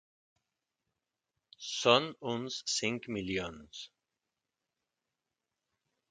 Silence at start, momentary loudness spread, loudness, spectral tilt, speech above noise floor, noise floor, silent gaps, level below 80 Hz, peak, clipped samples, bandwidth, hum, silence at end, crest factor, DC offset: 1.6 s; 20 LU; -32 LUFS; -3 dB/octave; 55 dB; -88 dBFS; none; -68 dBFS; -8 dBFS; under 0.1%; 9.4 kHz; none; 2.25 s; 30 dB; under 0.1%